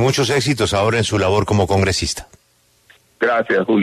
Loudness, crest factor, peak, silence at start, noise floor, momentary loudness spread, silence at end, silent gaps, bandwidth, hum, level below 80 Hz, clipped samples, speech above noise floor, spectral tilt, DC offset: -17 LUFS; 16 dB; -2 dBFS; 0 s; -58 dBFS; 5 LU; 0 s; none; 13.5 kHz; none; -40 dBFS; under 0.1%; 42 dB; -4.5 dB/octave; under 0.1%